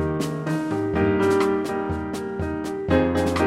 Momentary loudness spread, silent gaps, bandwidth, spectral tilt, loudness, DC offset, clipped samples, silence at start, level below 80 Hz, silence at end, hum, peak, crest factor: 8 LU; none; 15.5 kHz; -6.5 dB/octave; -23 LUFS; under 0.1%; under 0.1%; 0 s; -42 dBFS; 0 s; none; -6 dBFS; 18 dB